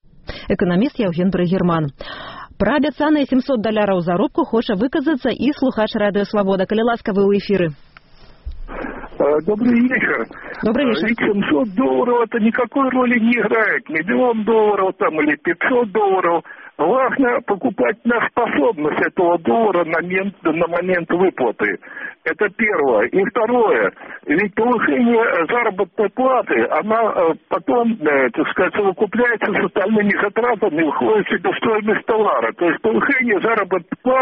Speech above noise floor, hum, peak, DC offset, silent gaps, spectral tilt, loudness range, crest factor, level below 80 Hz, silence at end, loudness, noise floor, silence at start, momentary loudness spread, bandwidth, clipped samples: 27 dB; none; -4 dBFS; under 0.1%; none; -4.5 dB/octave; 2 LU; 12 dB; -46 dBFS; 0 s; -17 LUFS; -44 dBFS; 0.3 s; 6 LU; 5.8 kHz; under 0.1%